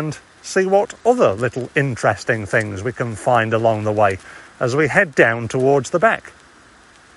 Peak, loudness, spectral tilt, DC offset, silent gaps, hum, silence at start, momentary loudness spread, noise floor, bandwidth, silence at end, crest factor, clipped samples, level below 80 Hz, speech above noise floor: 0 dBFS; -18 LUFS; -5.5 dB/octave; under 0.1%; none; none; 0 s; 9 LU; -48 dBFS; 11.5 kHz; 0.9 s; 18 dB; under 0.1%; -54 dBFS; 30 dB